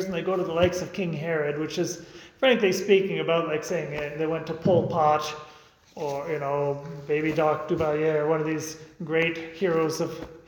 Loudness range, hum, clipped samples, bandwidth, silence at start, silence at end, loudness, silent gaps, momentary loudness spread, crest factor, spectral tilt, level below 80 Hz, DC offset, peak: 3 LU; none; under 0.1%; 19 kHz; 0 s; 0.05 s; -26 LUFS; none; 10 LU; 20 dB; -5.5 dB/octave; -58 dBFS; under 0.1%; -6 dBFS